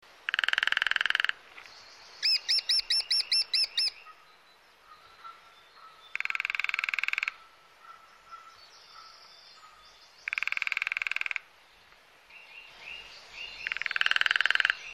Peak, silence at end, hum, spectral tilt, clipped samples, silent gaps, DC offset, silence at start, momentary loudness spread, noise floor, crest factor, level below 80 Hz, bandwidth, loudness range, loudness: -8 dBFS; 0 s; none; 2.5 dB/octave; under 0.1%; none; under 0.1%; 0.3 s; 24 LU; -59 dBFS; 24 dB; -74 dBFS; 16.5 kHz; 9 LU; -27 LUFS